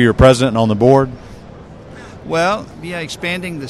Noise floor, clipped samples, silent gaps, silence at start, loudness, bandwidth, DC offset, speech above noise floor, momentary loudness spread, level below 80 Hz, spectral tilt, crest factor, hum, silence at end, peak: -36 dBFS; 0.2%; none; 0 s; -15 LUFS; 13 kHz; under 0.1%; 22 dB; 24 LU; -32 dBFS; -6 dB/octave; 16 dB; none; 0 s; 0 dBFS